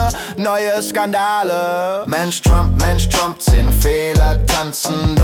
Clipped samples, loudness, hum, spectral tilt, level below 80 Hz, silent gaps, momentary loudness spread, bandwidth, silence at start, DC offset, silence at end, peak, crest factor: under 0.1%; -16 LUFS; none; -4.5 dB/octave; -18 dBFS; none; 5 LU; 18 kHz; 0 s; under 0.1%; 0 s; -4 dBFS; 10 dB